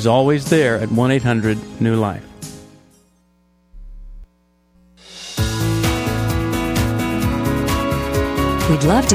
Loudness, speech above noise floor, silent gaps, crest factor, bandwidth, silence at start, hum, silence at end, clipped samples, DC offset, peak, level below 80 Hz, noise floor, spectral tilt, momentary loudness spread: -18 LUFS; 43 dB; none; 18 dB; 16 kHz; 0 s; none; 0 s; under 0.1%; under 0.1%; 0 dBFS; -32 dBFS; -58 dBFS; -5.5 dB/octave; 11 LU